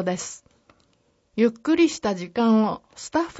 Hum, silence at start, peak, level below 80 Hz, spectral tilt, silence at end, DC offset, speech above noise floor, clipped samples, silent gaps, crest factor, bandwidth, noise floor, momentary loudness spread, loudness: none; 0 s; -8 dBFS; -60 dBFS; -5 dB/octave; 0 s; under 0.1%; 43 dB; under 0.1%; none; 16 dB; 8 kHz; -66 dBFS; 15 LU; -23 LUFS